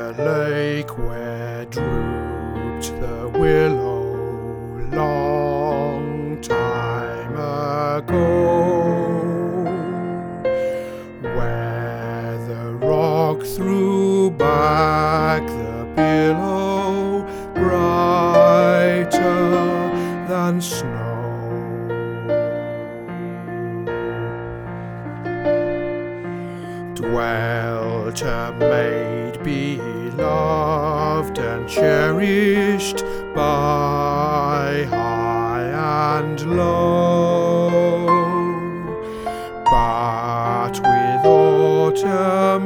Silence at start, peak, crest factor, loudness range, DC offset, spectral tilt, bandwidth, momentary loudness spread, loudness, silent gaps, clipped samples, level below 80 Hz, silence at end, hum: 0 s; 0 dBFS; 18 dB; 8 LU; under 0.1%; -6.5 dB/octave; 19.5 kHz; 11 LU; -20 LUFS; none; under 0.1%; -38 dBFS; 0 s; none